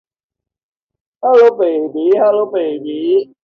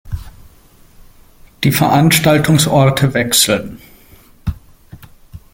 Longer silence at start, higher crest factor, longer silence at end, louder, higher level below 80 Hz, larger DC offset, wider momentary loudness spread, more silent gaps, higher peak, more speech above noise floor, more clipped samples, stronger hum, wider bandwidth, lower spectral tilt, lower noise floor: first, 1.2 s vs 0.05 s; about the same, 14 dB vs 16 dB; about the same, 0.2 s vs 0.15 s; about the same, -13 LUFS vs -12 LUFS; second, -68 dBFS vs -36 dBFS; neither; second, 11 LU vs 17 LU; neither; about the same, 0 dBFS vs 0 dBFS; first, 71 dB vs 33 dB; neither; neither; second, 6.2 kHz vs 17 kHz; first, -6.5 dB/octave vs -4.5 dB/octave; first, -84 dBFS vs -45 dBFS